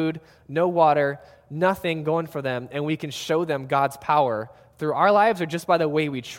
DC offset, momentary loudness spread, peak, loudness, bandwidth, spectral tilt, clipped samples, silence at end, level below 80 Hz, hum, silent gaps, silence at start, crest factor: under 0.1%; 11 LU; -4 dBFS; -23 LUFS; 17 kHz; -6 dB/octave; under 0.1%; 0 s; -62 dBFS; none; none; 0 s; 18 dB